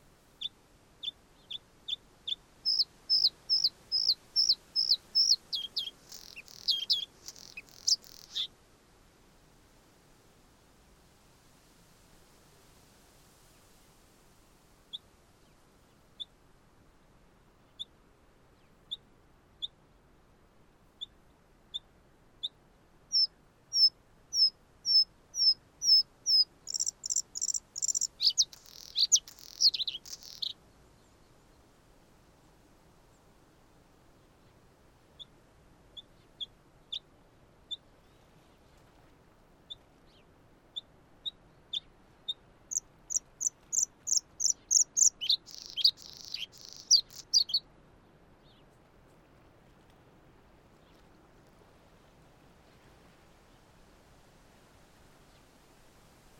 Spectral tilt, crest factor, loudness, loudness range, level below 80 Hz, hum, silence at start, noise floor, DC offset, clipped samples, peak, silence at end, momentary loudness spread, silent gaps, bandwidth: 2 dB/octave; 24 dB; -29 LUFS; 24 LU; -68 dBFS; none; 0.4 s; -63 dBFS; under 0.1%; under 0.1%; -12 dBFS; 8.8 s; 21 LU; none; 17.5 kHz